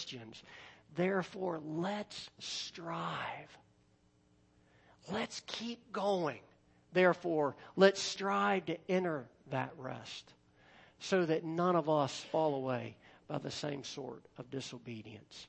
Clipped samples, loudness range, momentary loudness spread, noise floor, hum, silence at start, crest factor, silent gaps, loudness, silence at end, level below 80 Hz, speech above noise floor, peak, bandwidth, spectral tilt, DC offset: under 0.1%; 10 LU; 18 LU; -70 dBFS; none; 0 s; 24 dB; none; -36 LUFS; 0.05 s; -78 dBFS; 34 dB; -12 dBFS; 8.4 kHz; -5 dB/octave; under 0.1%